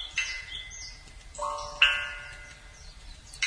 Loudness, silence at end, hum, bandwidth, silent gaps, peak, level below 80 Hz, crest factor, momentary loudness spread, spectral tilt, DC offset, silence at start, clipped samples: -28 LUFS; 0 s; none; 10.5 kHz; none; -6 dBFS; -50 dBFS; 28 dB; 26 LU; 0.5 dB/octave; under 0.1%; 0 s; under 0.1%